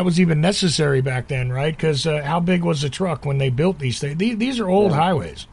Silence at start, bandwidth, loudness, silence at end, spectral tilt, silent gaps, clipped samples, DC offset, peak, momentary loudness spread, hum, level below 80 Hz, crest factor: 0 s; 11.5 kHz; -20 LUFS; 0.1 s; -6 dB/octave; none; under 0.1%; under 0.1%; -4 dBFS; 6 LU; none; -44 dBFS; 14 dB